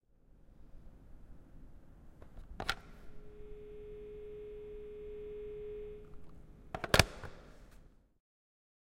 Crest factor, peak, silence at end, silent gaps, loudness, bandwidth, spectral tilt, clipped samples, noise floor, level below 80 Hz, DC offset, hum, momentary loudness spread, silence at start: 42 dB; 0 dBFS; 0.95 s; none; -38 LUFS; 16 kHz; -3.5 dB/octave; under 0.1%; -62 dBFS; -52 dBFS; under 0.1%; none; 26 LU; 0.3 s